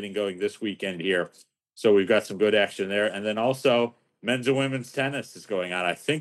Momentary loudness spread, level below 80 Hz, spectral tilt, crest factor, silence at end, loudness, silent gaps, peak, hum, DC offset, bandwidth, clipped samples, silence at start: 9 LU; -82 dBFS; -5 dB/octave; 18 dB; 0 s; -25 LUFS; none; -8 dBFS; none; under 0.1%; 12.5 kHz; under 0.1%; 0 s